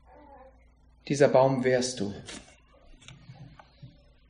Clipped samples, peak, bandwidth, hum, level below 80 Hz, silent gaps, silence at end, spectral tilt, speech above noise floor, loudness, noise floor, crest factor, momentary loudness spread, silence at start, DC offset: under 0.1%; -8 dBFS; 10.5 kHz; none; -60 dBFS; none; 0.4 s; -5 dB/octave; 34 dB; -25 LUFS; -59 dBFS; 22 dB; 28 LU; 1.05 s; under 0.1%